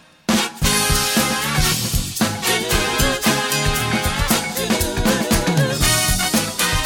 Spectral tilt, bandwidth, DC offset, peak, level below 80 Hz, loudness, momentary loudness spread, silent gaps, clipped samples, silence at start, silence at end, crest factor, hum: -3 dB/octave; 17.5 kHz; under 0.1%; -2 dBFS; -28 dBFS; -18 LUFS; 4 LU; none; under 0.1%; 0.3 s; 0 s; 16 dB; none